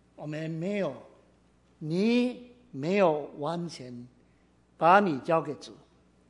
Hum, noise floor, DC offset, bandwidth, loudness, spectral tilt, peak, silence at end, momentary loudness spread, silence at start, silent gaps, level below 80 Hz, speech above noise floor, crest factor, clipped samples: none; -63 dBFS; under 0.1%; 11 kHz; -28 LUFS; -6.5 dB/octave; -6 dBFS; 0.55 s; 22 LU; 0.2 s; none; -70 dBFS; 36 dB; 24 dB; under 0.1%